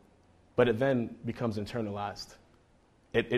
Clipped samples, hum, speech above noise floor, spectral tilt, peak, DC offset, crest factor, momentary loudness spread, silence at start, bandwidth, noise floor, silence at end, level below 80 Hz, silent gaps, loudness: under 0.1%; none; 34 dB; -6.5 dB/octave; -12 dBFS; under 0.1%; 22 dB; 12 LU; 0.55 s; 13.5 kHz; -64 dBFS; 0 s; -58 dBFS; none; -32 LUFS